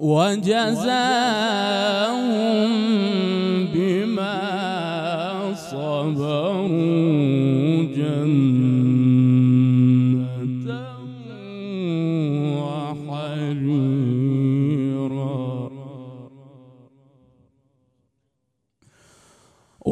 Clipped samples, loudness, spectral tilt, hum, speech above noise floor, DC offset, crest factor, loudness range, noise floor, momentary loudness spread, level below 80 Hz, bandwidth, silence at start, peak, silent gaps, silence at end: under 0.1%; -21 LUFS; -7 dB/octave; none; 55 dB; under 0.1%; 14 dB; 8 LU; -75 dBFS; 13 LU; -68 dBFS; 12 kHz; 0 s; -6 dBFS; none; 0 s